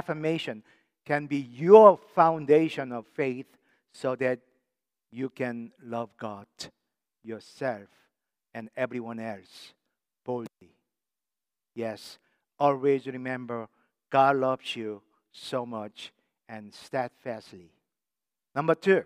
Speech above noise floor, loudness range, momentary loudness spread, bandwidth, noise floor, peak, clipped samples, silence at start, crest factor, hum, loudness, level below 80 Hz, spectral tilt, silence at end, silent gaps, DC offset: over 63 dB; 16 LU; 21 LU; 11.5 kHz; under -90 dBFS; -2 dBFS; under 0.1%; 0.1 s; 26 dB; none; -26 LUFS; -82 dBFS; -6.5 dB/octave; 0 s; none; under 0.1%